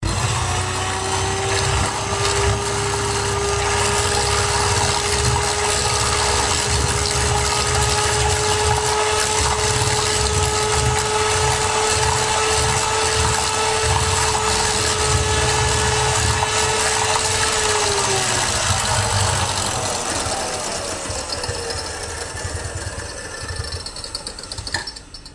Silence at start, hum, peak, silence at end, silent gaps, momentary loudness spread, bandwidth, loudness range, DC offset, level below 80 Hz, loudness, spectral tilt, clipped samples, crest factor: 0 s; none; -4 dBFS; 0 s; none; 10 LU; 11.5 kHz; 7 LU; under 0.1%; -32 dBFS; -18 LUFS; -2.5 dB/octave; under 0.1%; 16 dB